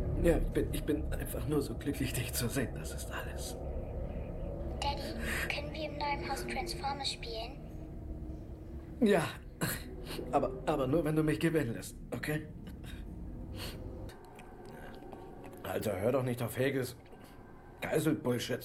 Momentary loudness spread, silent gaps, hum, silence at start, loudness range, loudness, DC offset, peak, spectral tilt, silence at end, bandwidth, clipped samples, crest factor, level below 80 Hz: 17 LU; none; none; 0 s; 7 LU; -36 LUFS; under 0.1%; -14 dBFS; -5.5 dB/octave; 0 s; 16 kHz; under 0.1%; 22 dB; -44 dBFS